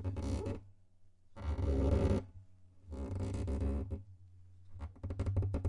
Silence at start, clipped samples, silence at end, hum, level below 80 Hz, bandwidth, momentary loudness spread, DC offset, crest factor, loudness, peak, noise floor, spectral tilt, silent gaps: 0 s; under 0.1%; 0 s; none; -42 dBFS; 11 kHz; 18 LU; under 0.1%; 18 dB; -38 LUFS; -20 dBFS; -61 dBFS; -8.5 dB/octave; none